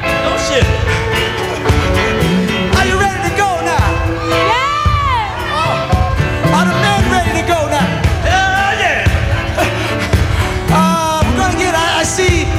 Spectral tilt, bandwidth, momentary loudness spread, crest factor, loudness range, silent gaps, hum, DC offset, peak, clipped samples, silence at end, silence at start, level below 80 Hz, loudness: -5 dB/octave; 16 kHz; 3 LU; 12 dB; 1 LU; none; none; under 0.1%; -2 dBFS; under 0.1%; 0 s; 0 s; -22 dBFS; -13 LUFS